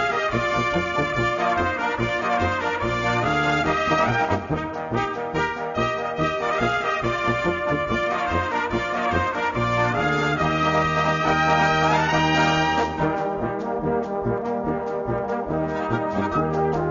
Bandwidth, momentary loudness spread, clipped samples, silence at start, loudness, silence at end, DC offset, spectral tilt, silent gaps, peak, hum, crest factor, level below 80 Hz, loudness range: 7.4 kHz; 6 LU; under 0.1%; 0 s; -22 LUFS; 0 s; under 0.1%; -5.5 dB/octave; none; -8 dBFS; none; 16 dB; -42 dBFS; 4 LU